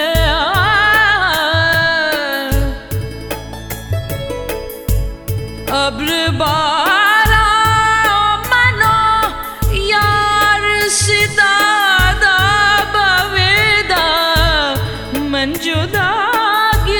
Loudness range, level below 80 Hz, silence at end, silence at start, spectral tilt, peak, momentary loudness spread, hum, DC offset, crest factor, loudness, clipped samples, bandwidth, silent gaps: 8 LU; -26 dBFS; 0 s; 0 s; -3 dB/octave; 0 dBFS; 12 LU; none; under 0.1%; 14 dB; -13 LUFS; under 0.1%; 19.5 kHz; none